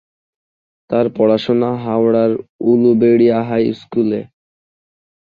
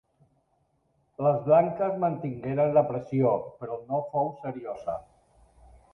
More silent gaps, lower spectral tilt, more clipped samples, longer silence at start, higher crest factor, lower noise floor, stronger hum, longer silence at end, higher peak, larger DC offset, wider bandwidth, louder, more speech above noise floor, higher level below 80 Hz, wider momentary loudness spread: first, 2.49-2.59 s vs none; second, -9 dB/octave vs -10.5 dB/octave; neither; second, 0.9 s vs 1.2 s; about the same, 14 dB vs 18 dB; first, under -90 dBFS vs -71 dBFS; neither; about the same, 1 s vs 0.9 s; first, -2 dBFS vs -10 dBFS; neither; second, 5.2 kHz vs 6 kHz; first, -15 LUFS vs -27 LUFS; first, over 76 dB vs 45 dB; about the same, -58 dBFS vs -62 dBFS; second, 8 LU vs 14 LU